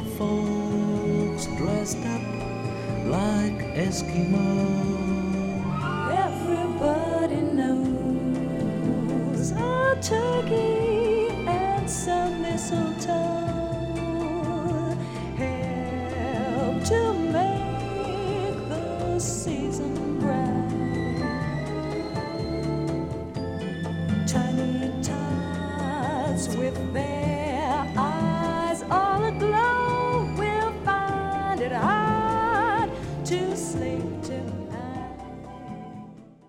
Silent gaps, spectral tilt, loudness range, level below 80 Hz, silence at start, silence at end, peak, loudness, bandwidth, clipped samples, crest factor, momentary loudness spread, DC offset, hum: none; -6 dB/octave; 4 LU; -44 dBFS; 0 s; 0.15 s; -10 dBFS; -26 LUFS; 16 kHz; under 0.1%; 14 dB; 7 LU; under 0.1%; none